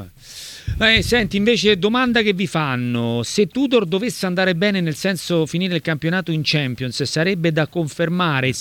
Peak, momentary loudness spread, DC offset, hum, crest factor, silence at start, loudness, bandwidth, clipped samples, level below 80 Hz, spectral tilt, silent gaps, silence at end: -2 dBFS; 7 LU; under 0.1%; none; 18 dB; 0 s; -18 LUFS; 18 kHz; under 0.1%; -40 dBFS; -5 dB/octave; none; 0 s